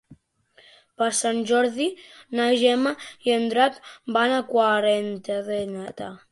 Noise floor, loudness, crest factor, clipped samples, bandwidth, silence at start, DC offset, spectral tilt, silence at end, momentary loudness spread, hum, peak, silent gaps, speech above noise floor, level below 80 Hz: -59 dBFS; -23 LUFS; 18 dB; under 0.1%; 11.5 kHz; 0.1 s; under 0.1%; -3 dB/octave; 0.15 s; 12 LU; none; -6 dBFS; none; 36 dB; -68 dBFS